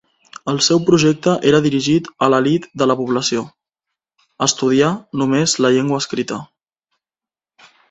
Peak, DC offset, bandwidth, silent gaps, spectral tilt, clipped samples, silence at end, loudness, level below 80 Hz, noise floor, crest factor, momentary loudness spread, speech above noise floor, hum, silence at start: 0 dBFS; under 0.1%; 8.4 kHz; none; -4.5 dB/octave; under 0.1%; 1.45 s; -16 LUFS; -56 dBFS; under -90 dBFS; 18 dB; 10 LU; over 74 dB; none; 0.45 s